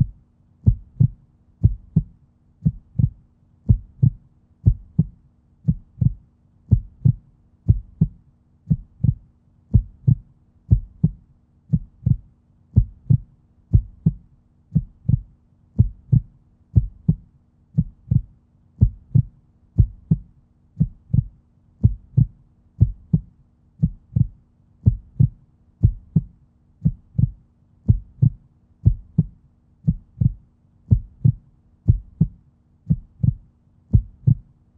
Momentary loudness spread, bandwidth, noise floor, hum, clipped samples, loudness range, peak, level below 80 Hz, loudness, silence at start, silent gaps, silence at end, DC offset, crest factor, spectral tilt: 5 LU; 1 kHz; -56 dBFS; none; under 0.1%; 0 LU; -2 dBFS; -30 dBFS; -23 LUFS; 0 s; none; 0.4 s; under 0.1%; 20 dB; -15 dB/octave